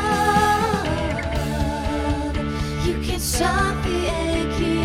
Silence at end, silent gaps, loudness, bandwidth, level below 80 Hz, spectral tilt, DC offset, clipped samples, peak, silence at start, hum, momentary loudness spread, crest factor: 0 s; none; -22 LUFS; 16.5 kHz; -30 dBFS; -5 dB/octave; under 0.1%; under 0.1%; -4 dBFS; 0 s; none; 6 LU; 16 dB